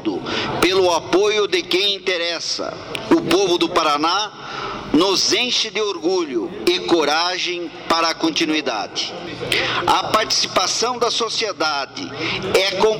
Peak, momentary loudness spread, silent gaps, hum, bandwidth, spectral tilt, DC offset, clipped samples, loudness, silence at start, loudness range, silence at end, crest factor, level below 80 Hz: -8 dBFS; 8 LU; none; none; 18 kHz; -2.5 dB/octave; under 0.1%; under 0.1%; -18 LUFS; 0 s; 1 LU; 0 s; 12 dB; -52 dBFS